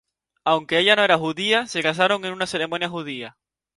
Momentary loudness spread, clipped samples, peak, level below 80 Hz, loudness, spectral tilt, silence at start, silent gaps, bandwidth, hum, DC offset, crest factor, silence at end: 13 LU; under 0.1%; 0 dBFS; -66 dBFS; -20 LUFS; -3.5 dB/octave; 0.45 s; none; 11.5 kHz; none; under 0.1%; 22 dB; 0.5 s